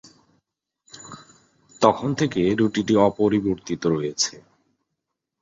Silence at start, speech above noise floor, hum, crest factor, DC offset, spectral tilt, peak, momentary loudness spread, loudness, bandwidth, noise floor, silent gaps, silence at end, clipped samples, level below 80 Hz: 0.95 s; 60 dB; none; 22 dB; under 0.1%; -5 dB/octave; -2 dBFS; 20 LU; -21 LUFS; 8 kHz; -81 dBFS; none; 1.05 s; under 0.1%; -56 dBFS